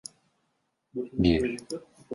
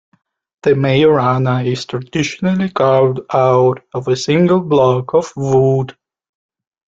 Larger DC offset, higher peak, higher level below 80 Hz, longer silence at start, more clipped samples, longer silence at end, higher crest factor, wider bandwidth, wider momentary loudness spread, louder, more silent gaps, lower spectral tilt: neither; second, -10 dBFS vs -2 dBFS; first, -46 dBFS vs -52 dBFS; first, 0.95 s vs 0.65 s; neither; second, 0 s vs 1.05 s; first, 20 dB vs 14 dB; first, 11.5 kHz vs 7.8 kHz; first, 16 LU vs 8 LU; second, -28 LUFS vs -14 LUFS; neither; about the same, -6 dB/octave vs -7 dB/octave